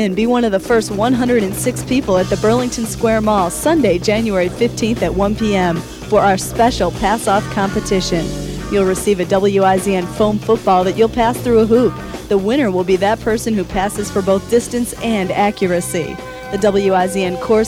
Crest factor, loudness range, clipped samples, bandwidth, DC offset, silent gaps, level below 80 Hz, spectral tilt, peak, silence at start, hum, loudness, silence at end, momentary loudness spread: 14 dB; 2 LU; under 0.1%; 16.5 kHz; under 0.1%; none; -34 dBFS; -5 dB/octave; 0 dBFS; 0 s; none; -16 LUFS; 0 s; 5 LU